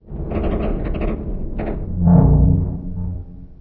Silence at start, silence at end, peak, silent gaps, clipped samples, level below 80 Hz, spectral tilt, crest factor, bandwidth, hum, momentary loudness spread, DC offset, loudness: 0.05 s; 0.05 s; 0 dBFS; none; under 0.1%; -24 dBFS; -13 dB/octave; 16 dB; 3.5 kHz; none; 15 LU; under 0.1%; -19 LUFS